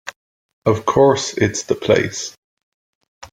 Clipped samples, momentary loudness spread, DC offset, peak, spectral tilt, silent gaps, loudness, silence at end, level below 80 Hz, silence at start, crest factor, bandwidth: under 0.1%; 14 LU; under 0.1%; -2 dBFS; -4.5 dB/octave; 0.16-0.62 s, 2.38-2.57 s, 2.63-3.01 s, 3.08-3.21 s; -17 LUFS; 0.05 s; -50 dBFS; 0.05 s; 18 dB; 15 kHz